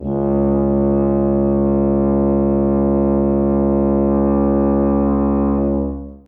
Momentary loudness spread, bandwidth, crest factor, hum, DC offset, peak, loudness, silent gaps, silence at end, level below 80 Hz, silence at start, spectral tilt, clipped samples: 2 LU; 2.7 kHz; 10 dB; none; under 0.1%; -6 dBFS; -16 LUFS; none; 0.1 s; -28 dBFS; 0 s; -14 dB/octave; under 0.1%